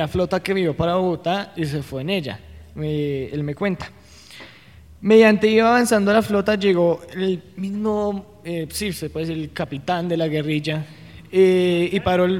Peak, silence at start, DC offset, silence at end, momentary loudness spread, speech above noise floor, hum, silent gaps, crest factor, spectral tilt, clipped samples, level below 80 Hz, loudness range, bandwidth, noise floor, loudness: -2 dBFS; 0 s; 0.1%; 0 s; 14 LU; 26 dB; none; none; 18 dB; -6 dB/octave; under 0.1%; -48 dBFS; 8 LU; 16 kHz; -46 dBFS; -20 LUFS